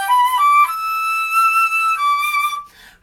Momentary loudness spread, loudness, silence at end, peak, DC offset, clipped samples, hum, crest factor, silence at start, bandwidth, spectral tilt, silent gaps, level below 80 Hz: 7 LU; -15 LUFS; 0.35 s; -6 dBFS; under 0.1%; under 0.1%; none; 12 dB; 0 s; 19.5 kHz; 3 dB/octave; none; -60 dBFS